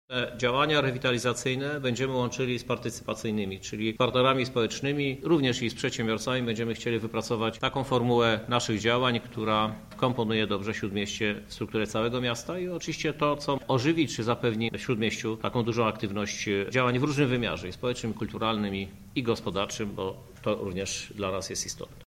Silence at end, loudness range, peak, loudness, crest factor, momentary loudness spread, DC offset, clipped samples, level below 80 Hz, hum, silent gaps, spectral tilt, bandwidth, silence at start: 0.05 s; 3 LU; -8 dBFS; -28 LUFS; 20 dB; 8 LU; under 0.1%; under 0.1%; -54 dBFS; none; none; -5 dB/octave; 16.5 kHz; 0.1 s